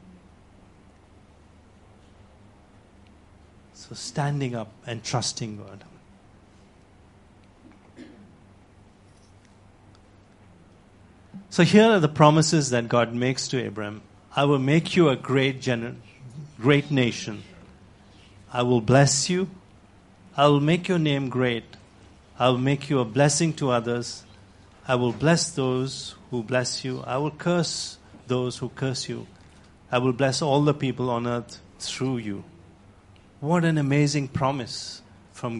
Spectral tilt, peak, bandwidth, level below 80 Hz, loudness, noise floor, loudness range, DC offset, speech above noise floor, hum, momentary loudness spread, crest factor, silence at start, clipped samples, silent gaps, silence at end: -5 dB/octave; 0 dBFS; 11.5 kHz; -58 dBFS; -24 LUFS; -53 dBFS; 11 LU; under 0.1%; 30 dB; none; 17 LU; 24 dB; 3.75 s; under 0.1%; none; 0 s